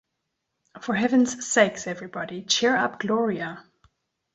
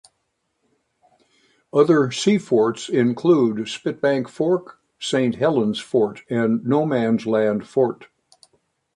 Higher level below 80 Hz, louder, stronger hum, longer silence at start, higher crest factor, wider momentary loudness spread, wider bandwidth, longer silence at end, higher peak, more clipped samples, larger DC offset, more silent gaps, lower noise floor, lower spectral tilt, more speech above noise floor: about the same, -68 dBFS vs -66 dBFS; second, -24 LUFS vs -20 LUFS; neither; second, 0.75 s vs 1.75 s; about the same, 20 dB vs 18 dB; first, 13 LU vs 6 LU; second, 8.2 kHz vs 11 kHz; second, 0.75 s vs 0.9 s; second, -6 dBFS vs -2 dBFS; neither; neither; neither; first, -80 dBFS vs -73 dBFS; second, -3 dB/octave vs -6 dB/octave; about the same, 56 dB vs 54 dB